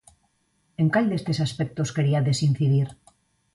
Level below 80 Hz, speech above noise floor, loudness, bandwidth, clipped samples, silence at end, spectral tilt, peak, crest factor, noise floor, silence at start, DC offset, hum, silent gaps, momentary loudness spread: -58 dBFS; 46 dB; -24 LUFS; 11.5 kHz; under 0.1%; 0.6 s; -6.5 dB/octave; -8 dBFS; 16 dB; -69 dBFS; 0.8 s; under 0.1%; none; none; 6 LU